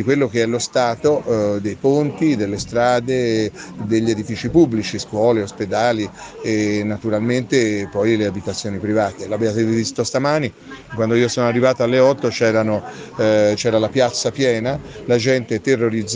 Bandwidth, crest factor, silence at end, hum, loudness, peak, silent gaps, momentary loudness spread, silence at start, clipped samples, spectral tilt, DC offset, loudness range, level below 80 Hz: 10 kHz; 16 dB; 0 s; none; -18 LUFS; -2 dBFS; none; 8 LU; 0 s; under 0.1%; -5.5 dB/octave; under 0.1%; 3 LU; -50 dBFS